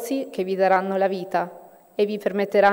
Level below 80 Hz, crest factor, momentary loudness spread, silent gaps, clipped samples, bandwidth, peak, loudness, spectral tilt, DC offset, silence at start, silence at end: -74 dBFS; 18 dB; 8 LU; none; under 0.1%; 16 kHz; -6 dBFS; -23 LUFS; -5.5 dB/octave; under 0.1%; 0 s; 0 s